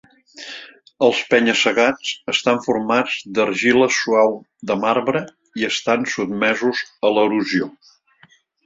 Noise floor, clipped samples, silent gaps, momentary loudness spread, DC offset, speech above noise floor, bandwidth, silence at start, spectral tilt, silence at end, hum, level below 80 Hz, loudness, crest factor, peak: -54 dBFS; under 0.1%; none; 13 LU; under 0.1%; 36 dB; 7.8 kHz; 0.35 s; -3.5 dB/octave; 0.95 s; none; -62 dBFS; -18 LUFS; 18 dB; -2 dBFS